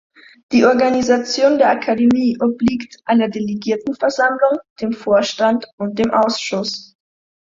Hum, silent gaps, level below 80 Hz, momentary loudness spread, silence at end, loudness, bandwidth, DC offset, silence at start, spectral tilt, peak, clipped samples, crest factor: none; 4.70-4.76 s, 5.73-5.78 s; -54 dBFS; 9 LU; 0.75 s; -17 LUFS; 7.6 kHz; under 0.1%; 0.5 s; -4.5 dB/octave; -2 dBFS; under 0.1%; 16 dB